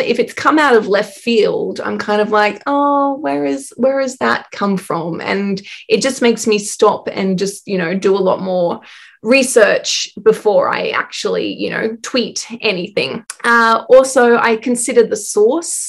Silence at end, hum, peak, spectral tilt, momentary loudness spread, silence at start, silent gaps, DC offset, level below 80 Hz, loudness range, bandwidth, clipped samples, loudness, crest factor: 0 s; none; 0 dBFS; -3.5 dB/octave; 9 LU; 0 s; none; under 0.1%; -62 dBFS; 4 LU; 13 kHz; 0.1%; -15 LUFS; 14 dB